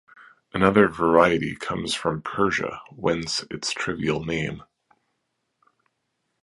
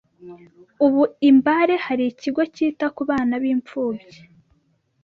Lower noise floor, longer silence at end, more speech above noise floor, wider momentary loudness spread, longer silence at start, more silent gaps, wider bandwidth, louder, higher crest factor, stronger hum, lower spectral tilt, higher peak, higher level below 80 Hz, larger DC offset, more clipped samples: first, -76 dBFS vs -65 dBFS; first, 1.8 s vs 1.05 s; first, 53 dB vs 45 dB; about the same, 11 LU vs 11 LU; about the same, 0.2 s vs 0.25 s; neither; first, 11.5 kHz vs 6.6 kHz; second, -23 LUFS vs -20 LUFS; first, 24 dB vs 16 dB; neither; about the same, -5 dB/octave vs -6 dB/octave; about the same, -2 dBFS vs -4 dBFS; first, -52 dBFS vs -62 dBFS; neither; neither